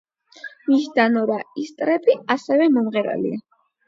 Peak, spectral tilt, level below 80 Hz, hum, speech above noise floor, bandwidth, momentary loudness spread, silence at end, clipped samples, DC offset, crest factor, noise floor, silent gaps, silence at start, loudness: -2 dBFS; -6 dB/octave; -72 dBFS; none; 22 dB; 7.6 kHz; 14 LU; 0.5 s; under 0.1%; under 0.1%; 18 dB; -41 dBFS; none; 0.45 s; -20 LUFS